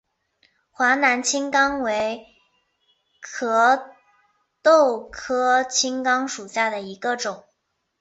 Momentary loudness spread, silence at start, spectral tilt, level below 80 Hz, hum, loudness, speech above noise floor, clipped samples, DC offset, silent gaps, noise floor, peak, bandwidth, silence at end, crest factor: 12 LU; 0.8 s; -1.5 dB/octave; -62 dBFS; none; -21 LUFS; 54 dB; under 0.1%; under 0.1%; none; -75 dBFS; -4 dBFS; 8.4 kHz; 0.6 s; 18 dB